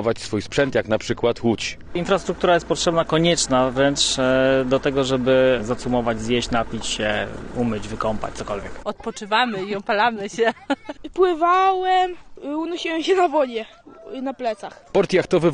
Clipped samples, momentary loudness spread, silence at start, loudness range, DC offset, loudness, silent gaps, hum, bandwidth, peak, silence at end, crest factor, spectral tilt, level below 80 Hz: under 0.1%; 12 LU; 0 s; 5 LU; under 0.1%; -21 LUFS; none; none; 10 kHz; -4 dBFS; 0 s; 16 dB; -4.5 dB/octave; -44 dBFS